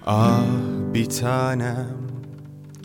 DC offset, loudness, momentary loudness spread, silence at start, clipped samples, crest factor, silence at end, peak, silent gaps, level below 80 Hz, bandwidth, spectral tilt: under 0.1%; -22 LUFS; 20 LU; 0.05 s; under 0.1%; 18 dB; 0 s; -4 dBFS; none; -56 dBFS; 18.5 kHz; -6.5 dB/octave